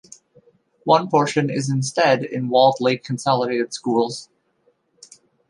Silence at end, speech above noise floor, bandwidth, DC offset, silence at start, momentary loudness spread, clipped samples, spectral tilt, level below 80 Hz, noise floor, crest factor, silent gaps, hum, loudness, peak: 1.25 s; 45 dB; 11.5 kHz; under 0.1%; 0.85 s; 7 LU; under 0.1%; -5 dB/octave; -66 dBFS; -64 dBFS; 18 dB; none; none; -20 LUFS; -2 dBFS